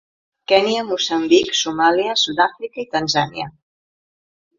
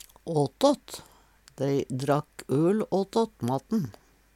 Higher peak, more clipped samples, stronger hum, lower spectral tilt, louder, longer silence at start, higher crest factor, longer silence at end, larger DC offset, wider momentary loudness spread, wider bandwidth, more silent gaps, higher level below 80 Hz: first, 0 dBFS vs -8 dBFS; neither; neither; second, -3 dB/octave vs -6.5 dB/octave; first, -18 LUFS vs -28 LUFS; first, 0.5 s vs 0.25 s; about the same, 20 dB vs 20 dB; first, 1.1 s vs 0.45 s; neither; first, 13 LU vs 8 LU; second, 7.6 kHz vs 16.5 kHz; neither; about the same, -58 dBFS vs -62 dBFS